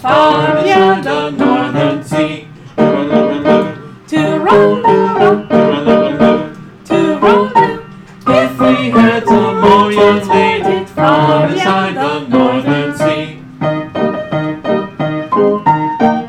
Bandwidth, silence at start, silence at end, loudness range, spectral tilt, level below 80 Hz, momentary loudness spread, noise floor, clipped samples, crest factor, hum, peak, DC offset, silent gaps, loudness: 13.5 kHz; 0 s; 0 s; 5 LU; -6.5 dB/octave; -46 dBFS; 9 LU; -31 dBFS; under 0.1%; 12 dB; none; 0 dBFS; under 0.1%; none; -11 LUFS